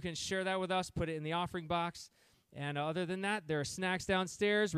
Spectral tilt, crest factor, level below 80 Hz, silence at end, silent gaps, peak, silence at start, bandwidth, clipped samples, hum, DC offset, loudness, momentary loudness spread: -4.5 dB/octave; 16 dB; -62 dBFS; 0 s; none; -20 dBFS; 0 s; 15 kHz; under 0.1%; none; under 0.1%; -36 LUFS; 8 LU